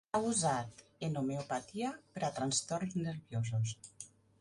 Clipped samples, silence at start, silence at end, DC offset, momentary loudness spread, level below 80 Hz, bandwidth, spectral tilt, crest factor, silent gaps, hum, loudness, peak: under 0.1%; 0.15 s; 0.35 s; under 0.1%; 15 LU; -70 dBFS; 11.5 kHz; -4.5 dB/octave; 18 dB; none; none; -37 LUFS; -20 dBFS